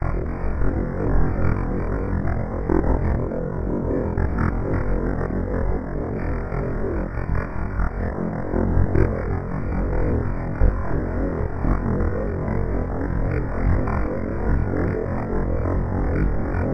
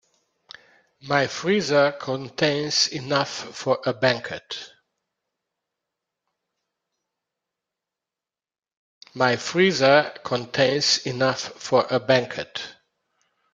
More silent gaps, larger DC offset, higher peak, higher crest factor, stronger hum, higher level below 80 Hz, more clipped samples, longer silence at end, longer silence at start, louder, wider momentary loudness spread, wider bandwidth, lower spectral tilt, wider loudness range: second, none vs 8.77-9.01 s; neither; about the same, -4 dBFS vs -2 dBFS; second, 16 dB vs 22 dB; neither; first, -26 dBFS vs -66 dBFS; neither; second, 0 s vs 0.8 s; second, 0 s vs 1.05 s; second, -25 LUFS vs -22 LUFS; second, 4 LU vs 12 LU; second, 5.4 kHz vs 9.4 kHz; first, -11 dB/octave vs -3.5 dB/octave; second, 2 LU vs 10 LU